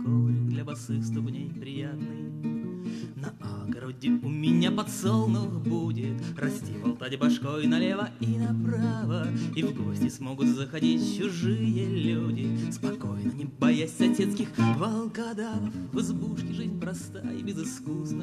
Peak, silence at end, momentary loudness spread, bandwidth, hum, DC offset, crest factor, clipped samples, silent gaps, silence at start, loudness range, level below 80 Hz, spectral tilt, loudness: -10 dBFS; 0 s; 10 LU; 13.5 kHz; none; under 0.1%; 18 dB; under 0.1%; none; 0 s; 5 LU; -64 dBFS; -6.5 dB/octave; -29 LUFS